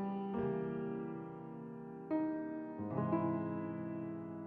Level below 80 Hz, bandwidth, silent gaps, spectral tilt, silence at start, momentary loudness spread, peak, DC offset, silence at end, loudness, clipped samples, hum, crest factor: -74 dBFS; 4.3 kHz; none; -9 dB/octave; 0 s; 12 LU; -24 dBFS; under 0.1%; 0 s; -41 LUFS; under 0.1%; none; 16 dB